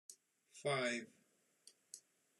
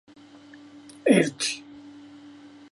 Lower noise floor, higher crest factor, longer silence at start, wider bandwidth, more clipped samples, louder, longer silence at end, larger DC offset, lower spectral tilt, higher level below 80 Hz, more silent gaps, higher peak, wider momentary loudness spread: first, -70 dBFS vs -49 dBFS; about the same, 24 dB vs 22 dB; second, 0.1 s vs 1.05 s; first, 13 kHz vs 11.5 kHz; neither; second, -41 LUFS vs -24 LUFS; second, 0.4 s vs 0.75 s; neither; about the same, -3.5 dB/octave vs -4 dB/octave; second, under -90 dBFS vs -72 dBFS; neither; second, -24 dBFS vs -6 dBFS; second, 22 LU vs 26 LU